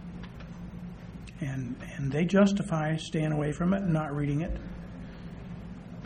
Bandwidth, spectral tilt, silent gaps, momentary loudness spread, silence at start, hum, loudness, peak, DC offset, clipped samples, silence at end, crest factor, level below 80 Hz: 10 kHz; -7 dB/octave; none; 18 LU; 0 s; none; -29 LUFS; -10 dBFS; under 0.1%; under 0.1%; 0 s; 20 dB; -46 dBFS